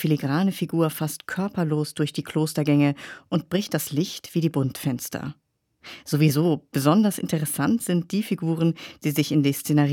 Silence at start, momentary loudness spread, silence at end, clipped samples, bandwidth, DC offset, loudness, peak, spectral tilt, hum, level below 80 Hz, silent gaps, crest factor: 0 s; 8 LU; 0 s; under 0.1%; 18.5 kHz; under 0.1%; -24 LUFS; -6 dBFS; -6 dB/octave; none; -66 dBFS; none; 18 dB